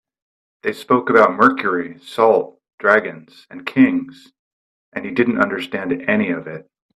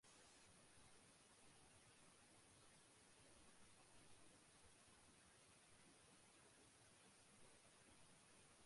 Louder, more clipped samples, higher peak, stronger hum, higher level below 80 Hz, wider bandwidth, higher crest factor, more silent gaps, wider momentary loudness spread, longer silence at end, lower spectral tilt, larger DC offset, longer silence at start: first, -17 LUFS vs -69 LUFS; neither; first, 0 dBFS vs -56 dBFS; neither; first, -62 dBFS vs -86 dBFS; about the same, 12.5 kHz vs 11.5 kHz; about the same, 18 dB vs 14 dB; first, 2.74-2.78 s, 4.39-4.92 s vs none; first, 17 LU vs 1 LU; first, 0.35 s vs 0 s; first, -6.5 dB/octave vs -2.5 dB/octave; neither; first, 0.65 s vs 0.05 s